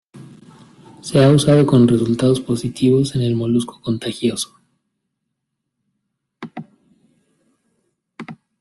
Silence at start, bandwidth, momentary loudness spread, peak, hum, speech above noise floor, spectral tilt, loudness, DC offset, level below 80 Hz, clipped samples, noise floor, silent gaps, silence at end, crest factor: 0.15 s; 12.5 kHz; 24 LU; -2 dBFS; none; 61 dB; -6.5 dB/octave; -16 LUFS; under 0.1%; -52 dBFS; under 0.1%; -77 dBFS; none; 0.25 s; 16 dB